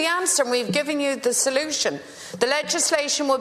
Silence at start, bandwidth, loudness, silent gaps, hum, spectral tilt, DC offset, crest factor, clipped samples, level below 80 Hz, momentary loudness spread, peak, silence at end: 0 s; 14 kHz; -21 LUFS; none; none; -1.5 dB/octave; under 0.1%; 20 dB; under 0.1%; -68 dBFS; 6 LU; -2 dBFS; 0 s